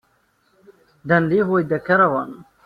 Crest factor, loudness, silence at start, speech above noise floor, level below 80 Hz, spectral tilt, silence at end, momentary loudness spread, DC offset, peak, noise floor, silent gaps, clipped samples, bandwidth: 18 dB; -18 LUFS; 1.05 s; 45 dB; -60 dBFS; -9 dB/octave; 0.25 s; 14 LU; under 0.1%; -4 dBFS; -63 dBFS; none; under 0.1%; 5.2 kHz